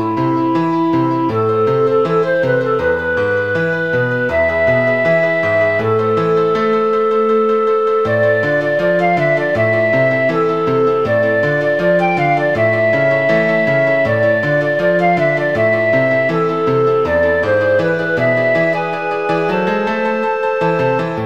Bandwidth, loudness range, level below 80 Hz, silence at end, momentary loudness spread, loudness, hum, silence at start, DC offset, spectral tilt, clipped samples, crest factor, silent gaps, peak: 8.6 kHz; 1 LU; -48 dBFS; 0 s; 3 LU; -14 LUFS; none; 0 s; 0.6%; -7.5 dB/octave; under 0.1%; 12 dB; none; -2 dBFS